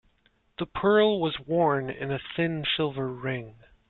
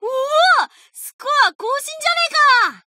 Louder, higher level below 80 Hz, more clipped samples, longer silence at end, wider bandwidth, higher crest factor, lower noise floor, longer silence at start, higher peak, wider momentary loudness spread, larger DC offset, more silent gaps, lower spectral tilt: second, -27 LUFS vs -15 LUFS; first, -58 dBFS vs -90 dBFS; neither; first, 0.4 s vs 0.1 s; second, 4.3 kHz vs 16 kHz; about the same, 18 dB vs 14 dB; first, -67 dBFS vs -36 dBFS; first, 0.6 s vs 0 s; second, -10 dBFS vs -2 dBFS; about the same, 13 LU vs 15 LU; neither; second, none vs 1.13-1.19 s, 1.55-1.59 s; first, -9.5 dB/octave vs 2 dB/octave